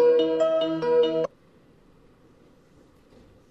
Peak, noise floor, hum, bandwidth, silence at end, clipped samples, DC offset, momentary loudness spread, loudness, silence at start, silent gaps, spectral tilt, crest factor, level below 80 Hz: -12 dBFS; -57 dBFS; none; 7.8 kHz; 2.25 s; under 0.1%; under 0.1%; 7 LU; -23 LUFS; 0 s; none; -6 dB/octave; 14 dB; -66 dBFS